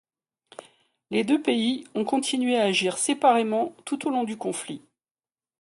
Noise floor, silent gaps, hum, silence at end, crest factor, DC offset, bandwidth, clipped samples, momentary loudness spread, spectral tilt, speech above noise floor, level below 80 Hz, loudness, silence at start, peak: under -90 dBFS; none; none; 0.8 s; 18 dB; under 0.1%; 11.5 kHz; under 0.1%; 10 LU; -3.5 dB/octave; over 66 dB; -74 dBFS; -25 LUFS; 1.1 s; -8 dBFS